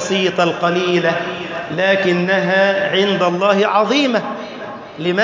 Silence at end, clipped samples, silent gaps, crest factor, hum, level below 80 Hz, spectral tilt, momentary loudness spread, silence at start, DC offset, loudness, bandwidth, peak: 0 s; under 0.1%; none; 14 dB; none; -60 dBFS; -5 dB/octave; 11 LU; 0 s; under 0.1%; -16 LUFS; 7.6 kHz; -2 dBFS